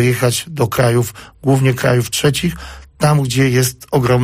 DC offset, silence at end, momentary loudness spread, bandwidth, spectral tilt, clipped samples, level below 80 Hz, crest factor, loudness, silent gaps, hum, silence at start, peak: under 0.1%; 0 s; 8 LU; 15.5 kHz; -5.5 dB/octave; under 0.1%; -40 dBFS; 12 dB; -15 LUFS; none; none; 0 s; -2 dBFS